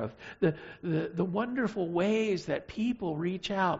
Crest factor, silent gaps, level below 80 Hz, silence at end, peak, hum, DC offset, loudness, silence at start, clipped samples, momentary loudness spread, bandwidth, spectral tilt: 16 dB; none; -62 dBFS; 0 s; -14 dBFS; none; under 0.1%; -32 LUFS; 0 s; under 0.1%; 5 LU; 8 kHz; -5.5 dB/octave